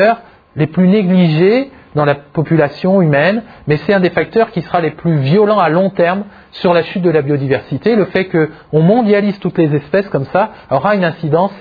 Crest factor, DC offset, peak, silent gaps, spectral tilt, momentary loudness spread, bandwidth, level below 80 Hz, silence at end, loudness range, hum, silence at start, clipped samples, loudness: 12 dB; under 0.1%; 0 dBFS; none; -10 dB/octave; 7 LU; 5 kHz; -50 dBFS; 0 s; 1 LU; none; 0 s; under 0.1%; -13 LUFS